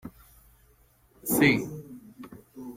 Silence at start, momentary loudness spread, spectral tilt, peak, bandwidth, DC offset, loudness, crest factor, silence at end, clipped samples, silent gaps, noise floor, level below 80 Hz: 0.05 s; 25 LU; -4.5 dB/octave; -8 dBFS; 16.5 kHz; under 0.1%; -25 LUFS; 22 dB; 0 s; under 0.1%; none; -62 dBFS; -60 dBFS